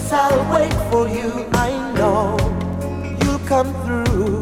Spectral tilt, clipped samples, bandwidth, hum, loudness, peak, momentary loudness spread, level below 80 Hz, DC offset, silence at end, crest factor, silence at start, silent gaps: -6 dB/octave; under 0.1%; 17 kHz; none; -19 LUFS; -2 dBFS; 7 LU; -30 dBFS; under 0.1%; 0 s; 16 dB; 0 s; none